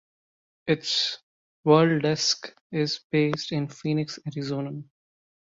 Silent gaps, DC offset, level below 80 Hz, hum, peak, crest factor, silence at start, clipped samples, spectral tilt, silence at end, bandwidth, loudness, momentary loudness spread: 1.23-1.63 s, 2.61-2.70 s, 3.04-3.10 s; under 0.1%; -68 dBFS; none; -6 dBFS; 22 dB; 0.65 s; under 0.1%; -5 dB/octave; 0.65 s; 7.8 kHz; -25 LUFS; 13 LU